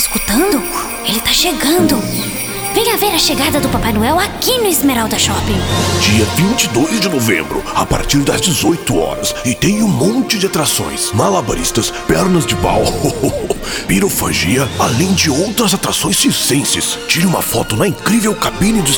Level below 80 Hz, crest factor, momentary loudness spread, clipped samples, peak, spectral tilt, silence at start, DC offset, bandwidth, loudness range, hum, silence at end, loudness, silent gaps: -32 dBFS; 14 dB; 5 LU; under 0.1%; 0 dBFS; -3.5 dB/octave; 0 s; under 0.1%; over 20 kHz; 1 LU; none; 0 s; -13 LUFS; none